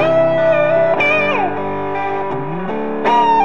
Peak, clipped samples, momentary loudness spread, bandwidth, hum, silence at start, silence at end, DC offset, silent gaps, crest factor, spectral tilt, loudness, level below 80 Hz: -4 dBFS; under 0.1%; 9 LU; 7 kHz; none; 0 s; 0 s; 4%; none; 12 dB; -6.5 dB/octave; -16 LUFS; -58 dBFS